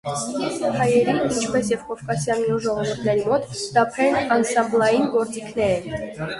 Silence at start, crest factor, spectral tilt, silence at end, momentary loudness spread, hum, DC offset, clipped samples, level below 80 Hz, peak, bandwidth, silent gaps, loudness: 0.05 s; 18 dB; -5 dB/octave; 0 s; 7 LU; none; under 0.1%; under 0.1%; -52 dBFS; -4 dBFS; 11.5 kHz; none; -21 LUFS